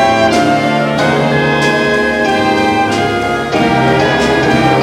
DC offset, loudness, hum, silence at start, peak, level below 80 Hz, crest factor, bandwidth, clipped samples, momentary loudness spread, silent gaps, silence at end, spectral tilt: under 0.1%; -11 LUFS; none; 0 s; -2 dBFS; -38 dBFS; 8 dB; 16.5 kHz; under 0.1%; 3 LU; none; 0 s; -5.5 dB/octave